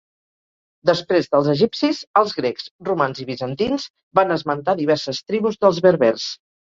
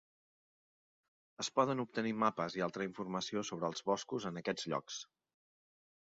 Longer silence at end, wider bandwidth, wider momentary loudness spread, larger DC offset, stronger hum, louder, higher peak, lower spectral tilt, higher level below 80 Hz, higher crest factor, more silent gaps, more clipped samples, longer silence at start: second, 0.4 s vs 1 s; about the same, 7.6 kHz vs 7.6 kHz; first, 11 LU vs 7 LU; neither; neither; first, -20 LUFS vs -38 LUFS; first, -2 dBFS vs -18 dBFS; first, -5.5 dB/octave vs -4 dB/octave; first, -58 dBFS vs -80 dBFS; about the same, 18 dB vs 22 dB; first, 2.07-2.14 s, 2.71-2.79 s, 3.90-3.94 s, 4.03-4.11 s vs none; neither; second, 0.85 s vs 1.4 s